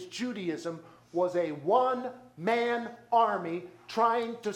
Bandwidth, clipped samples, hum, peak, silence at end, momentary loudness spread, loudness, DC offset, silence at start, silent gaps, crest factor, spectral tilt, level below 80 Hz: 13.5 kHz; under 0.1%; none; -12 dBFS; 0 s; 11 LU; -30 LUFS; under 0.1%; 0 s; none; 18 dB; -5.5 dB/octave; -80 dBFS